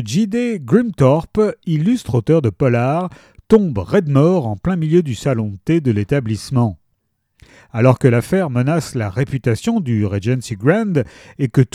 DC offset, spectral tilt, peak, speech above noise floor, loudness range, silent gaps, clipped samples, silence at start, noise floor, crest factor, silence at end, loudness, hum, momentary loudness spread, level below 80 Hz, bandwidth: under 0.1%; -7.5 dB/octave; 0 dBFS; 52 dB; 2 LU; none; under 0.1%; 0 s; -68 dBFS; 16 dB; 0.1 s; -17 LUFS; none; 7 LU; -44 dBFS; 14 kHz